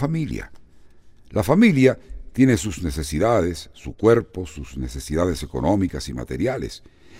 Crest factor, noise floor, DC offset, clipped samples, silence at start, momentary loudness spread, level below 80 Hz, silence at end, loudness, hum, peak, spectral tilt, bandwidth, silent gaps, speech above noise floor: 20 dB; -46 dBFS; under 0.1%; under 0.1%; 0 s; 17 LU; -38 dBFS; 0 s; -21 LUFS; none; -2 dBFS; -6.5 dB/octave; 16 kHz; none; 25 dB